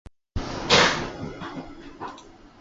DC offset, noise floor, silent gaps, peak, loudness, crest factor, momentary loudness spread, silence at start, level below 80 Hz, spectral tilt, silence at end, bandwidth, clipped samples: under 0.1%; -46 dBFS; none; -4 dBFS; -22 LUFS; 24 dB; 21 LU; 0.35 s; -44 dBFS; -3 dB/octave; 0.15 s; 8 kHz; under 0.1%